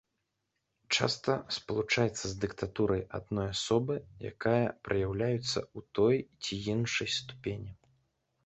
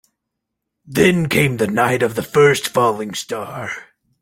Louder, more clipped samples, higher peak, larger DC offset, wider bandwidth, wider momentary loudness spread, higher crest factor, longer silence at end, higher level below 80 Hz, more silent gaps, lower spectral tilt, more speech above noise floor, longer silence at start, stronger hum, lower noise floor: second, -32 LUFS vs -17 LUFS; neither; second, -10 dBFS vs 0 dBFS; neither; second, 8.4 kHz vs 17 kHz; second, 9 LU vs 13 LU; first, 24 dB vs 18 dB; first, 0.75 s vs 0.4 s; about the same, -56 dBFS vs -52 dBFS; neither; about the same, -4.5 dB/octave vs -5 dB/octave; second, 51 dB vs 62 dB; about the same, 0.9 s vs 0.85 s; neither; first, -83 dBFS vs -79 dBFS